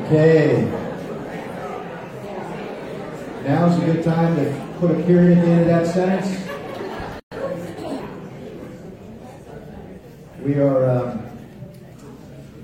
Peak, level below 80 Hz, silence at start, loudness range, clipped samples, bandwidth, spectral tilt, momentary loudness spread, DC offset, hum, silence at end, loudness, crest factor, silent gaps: -4 dBFS; -50 dBFS; 0 s; 14 LU; under 0.1%; 9.2 kHz; -8.5 dB/octave; 24 LU; under 0.1%; none; 0 s; -20 LUFS; 18 dB; 7.23-7.31 s